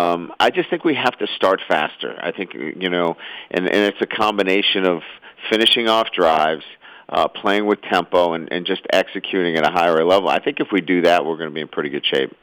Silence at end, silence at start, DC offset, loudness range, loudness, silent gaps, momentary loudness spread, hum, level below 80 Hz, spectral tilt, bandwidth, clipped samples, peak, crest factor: 0.1 s; 0 s; under 0.1%; 3 LU; -18 LUFS; none; 10 LU; none; -62 dBFS; -4.5 dB/octave; over 20 kHz; under 0.1%; -4 dBFS; 16 dB